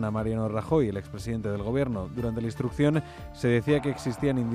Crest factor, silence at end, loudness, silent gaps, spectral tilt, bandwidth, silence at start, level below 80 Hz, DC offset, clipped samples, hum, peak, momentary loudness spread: 16 dB; 0 s; -28 LUFS; none; -7.5 dB/octave; 14.5 kHz; 0 s; -46 dBFS; under 0.1%; under 0.1%; none; -12 dBFS; 6 LU